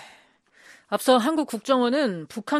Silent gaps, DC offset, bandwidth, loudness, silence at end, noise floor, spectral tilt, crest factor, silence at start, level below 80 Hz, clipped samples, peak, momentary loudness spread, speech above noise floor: none; under 0.1%; 14.5 kHz; -23 LUFS; 0 s; -57 dBFS; -4 dB/octave; 18 dB; 0 s; -76 dBFS; under 0.1%; -6 dBFS; 9 LU; 35 dB